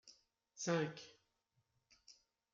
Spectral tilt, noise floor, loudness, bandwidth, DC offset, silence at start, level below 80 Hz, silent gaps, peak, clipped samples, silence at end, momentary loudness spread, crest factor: -4.5 dB/octave; -84 dBFS; -41 LUFS; 7.6 kHz; under 0.1%; 0.05 s; -88 dBFS; none; -24 dBFS; under 0.1%; 0.4 s; 25 LU; 22 dB